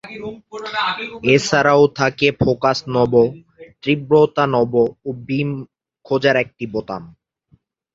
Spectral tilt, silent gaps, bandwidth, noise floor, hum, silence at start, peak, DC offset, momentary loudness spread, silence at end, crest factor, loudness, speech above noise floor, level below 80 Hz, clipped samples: -5.5 dB/octave; none; 7.8 kHz; -58 dBFS; none; 0.05 s; 0 dBFS; under 0.1%; 16 LU; 0.85 s; 18 dB; -17 LUFS; 41 dB; -50 dBFS; under 0.1%